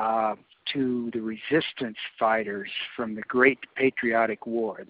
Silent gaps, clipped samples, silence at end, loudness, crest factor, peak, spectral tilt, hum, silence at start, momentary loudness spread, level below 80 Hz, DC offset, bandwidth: none; under 0.1%; 0.05 s; -27 LUFS; 22 dB; -6 dBFS; -2.5 dB/octave; none; 0 s; 11 LU; -68 dBFS; under 0.1%; 5.2 kHz